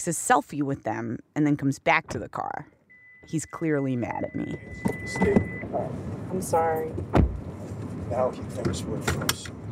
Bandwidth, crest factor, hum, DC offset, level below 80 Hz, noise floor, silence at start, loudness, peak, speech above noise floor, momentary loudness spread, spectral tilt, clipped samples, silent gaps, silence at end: 16 kHz; 20 dB; none; under 0.1%; -40 dBFS; -53 dBFS; 0 s; -28 LUFS; -6 dBFS; 26 dB; 11 LU; -5.5 dB/octave; under 0.1%; none; 0 s